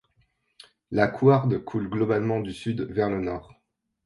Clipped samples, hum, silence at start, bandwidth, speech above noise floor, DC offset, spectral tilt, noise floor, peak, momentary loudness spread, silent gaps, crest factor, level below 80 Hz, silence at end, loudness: under 0.1%; none; 0.9 s; 11 kHz; 44 dB; under 0.1%; -8.5 dB/octave; -69 dBFS; -6 dBFS; 11 LU; none; 20 dB; -54 dBFS; 0.65 s; -25 LUFS